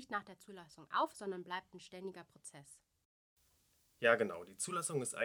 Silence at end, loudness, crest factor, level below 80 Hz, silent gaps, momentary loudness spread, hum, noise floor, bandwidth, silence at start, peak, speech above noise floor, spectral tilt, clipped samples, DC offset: 0 s; -39 LUFS; 28 dB; -84 dBFS; 3.05-3.37 s; 22 LU; none; -75 dBFS; 19 kHz; 0 s; -14 dBFS; 34 dB; -3 dB/octave; under 0.1%; under 0.1%